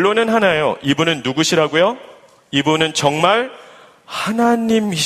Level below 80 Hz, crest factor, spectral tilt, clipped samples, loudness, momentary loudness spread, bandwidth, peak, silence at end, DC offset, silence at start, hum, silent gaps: -56 dBFS; 16 dB; -4 dB/octave; under 0.1%; -16 LUFS; 7 LU; 15 kHz; 0 dBFS; 0 s; under 0.1%; 0 s; none; none